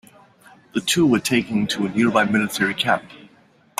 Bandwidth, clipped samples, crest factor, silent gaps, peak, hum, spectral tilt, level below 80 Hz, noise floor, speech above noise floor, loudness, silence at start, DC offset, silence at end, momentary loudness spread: 16 kHz; under 0.1%; 18 dB; none; -4 dBFS; none; -4 dB/octave; -58 dBFS; -55 dBFS; 35 dB; -20 LUFS; 0.75 s; under 0.1%; 0.55 s; 6 LU